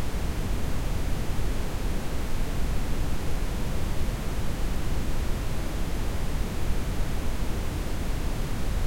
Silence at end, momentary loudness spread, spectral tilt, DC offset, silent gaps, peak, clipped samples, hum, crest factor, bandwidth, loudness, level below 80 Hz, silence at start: 0 s; 1 LU; -5.5 dB/octave; under 0.1%; none; -12 dBFS; under 0.1%; none; 14 dB; 16.5 kHz; -32 LUFS; -28 dBFS; 0 s